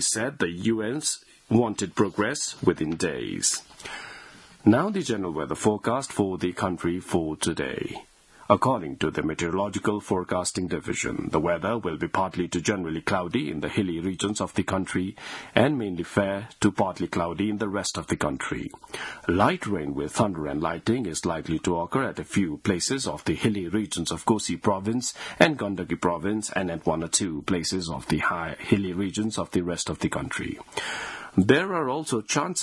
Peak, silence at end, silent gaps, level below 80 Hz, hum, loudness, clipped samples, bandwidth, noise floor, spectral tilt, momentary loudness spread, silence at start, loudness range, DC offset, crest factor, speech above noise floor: 0 dBFS; 0 s; none; -54 dBFS; none; -26 LUFS; under 0.1%; 12 kHz; -48 dBFS; -4.5 dB/octave; 7 LU; 0 s; 2 LU; under 0.1%; 26 dB; 21 dB